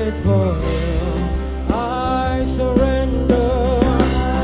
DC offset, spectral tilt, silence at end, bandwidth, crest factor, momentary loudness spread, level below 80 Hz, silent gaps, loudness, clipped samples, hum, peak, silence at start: under 0.1%; -11.5 dB/octave; 0 s; 4 kHz; 16 dB; 5 LU; -22 dBFS; none; -18 LUFS; under 0.1%; none; 0 dBFS; 0 s